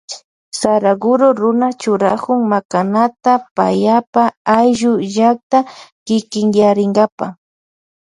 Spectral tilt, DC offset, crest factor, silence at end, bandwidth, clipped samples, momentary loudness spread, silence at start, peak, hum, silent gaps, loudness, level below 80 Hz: -6 dB/octave; under 0.1%; 14 dB; 0.65 s; 11.5 kHz; under 0.1%; 7 LU; 0.1 s; 0 dBFS; none; 0.24-0.52 s, 2.65-2.69 s, 3.51-3.55 s, 4.07-4.13 s, 4.37-4.45 s, 5.43-5.50 s, 5.92-6.06 s, 7.12-7.18 s; -14 LUFS; -58 dBFS